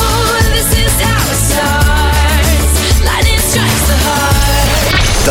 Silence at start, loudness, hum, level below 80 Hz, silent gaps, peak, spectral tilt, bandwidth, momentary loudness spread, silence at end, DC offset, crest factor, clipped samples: 0 s; -10 LUFS; none; -14 dBFS; none; 0 dBFS; -3.5 dB/octave; 19.5 kHz; 1 LU; 0 s; under 0.1%; 10 dB; under 0.1%